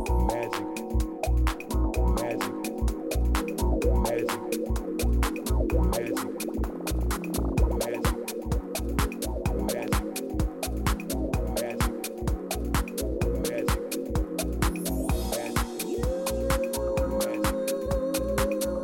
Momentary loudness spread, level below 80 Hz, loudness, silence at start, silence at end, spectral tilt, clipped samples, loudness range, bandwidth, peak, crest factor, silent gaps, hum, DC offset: 4 LU; -30 dBFS; -29 LUFS; 0 s; 0 s; -5.5 dB/octave; under 0.1%; 2 LU; 17.5 kHz; -8 dBFS; 18 dB; none; none; under 0.1%